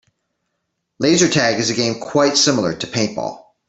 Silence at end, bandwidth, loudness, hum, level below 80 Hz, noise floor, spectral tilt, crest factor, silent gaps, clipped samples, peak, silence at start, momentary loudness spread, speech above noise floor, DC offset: 0.3 s; 8.4 kHz; -17 LUFS; none; -56 dBFS; -74 dBFS; -3.5 dB/octave; 18 dB; none; under 0.1%; -2 dBFS; 1 s; 8 LU; 57 dB; under 0.1%